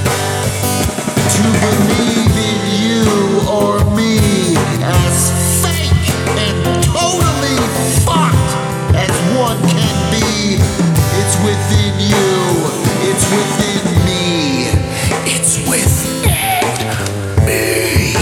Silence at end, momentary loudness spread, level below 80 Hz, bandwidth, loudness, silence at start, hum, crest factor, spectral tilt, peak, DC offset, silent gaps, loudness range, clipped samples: 0 s; 3 LU; -28 dBFS; 18.5 kHz; -13 LUFS; 0 s; none; 12 dB; -4.5 dB/octave; 0 dBFS; under 0.1%; none; 1 LU; under 0.1%